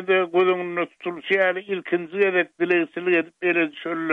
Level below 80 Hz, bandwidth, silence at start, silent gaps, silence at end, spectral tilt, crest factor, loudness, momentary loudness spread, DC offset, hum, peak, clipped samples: -76 dBFS; 4.1 kHz; 0 s; none; 0 s; -7 dB/octave; 14 dB; -22 LUFS; 7 LU; under 0.1%; none; -8 dBFS; under 0.1%